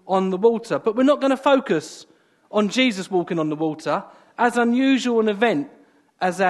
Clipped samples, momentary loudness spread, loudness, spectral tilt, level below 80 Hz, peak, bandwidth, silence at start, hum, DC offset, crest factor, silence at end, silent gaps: under 0.1%; 8 LU; -21 LUFS; -5 dB/octave; -72 dBFS; -4 dBFS; 12 kHz; 0.05 s; none; under 0.1%; 16 dB; 0 s; none